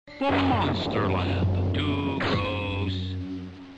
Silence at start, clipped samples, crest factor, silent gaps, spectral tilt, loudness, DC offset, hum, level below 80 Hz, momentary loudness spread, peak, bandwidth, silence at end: 0.05 s; under 0.1%; 12 dB; none; -7.5 dB/octave; -26 LUFS; under 0.1%; none; -48 dBFS; 9 LU; -14 dBFS; 8 kHz; 0 s